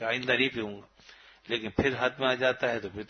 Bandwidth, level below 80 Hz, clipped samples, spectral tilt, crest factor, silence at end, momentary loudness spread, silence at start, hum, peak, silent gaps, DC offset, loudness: 6.6 kHz; -56 dBFS; under 0.1%; -5 dB/octave; 20 dB; 0.05 s; 10 LU; 0 s; none; -10 dBFS; none; under 0.1%; -28 LUFS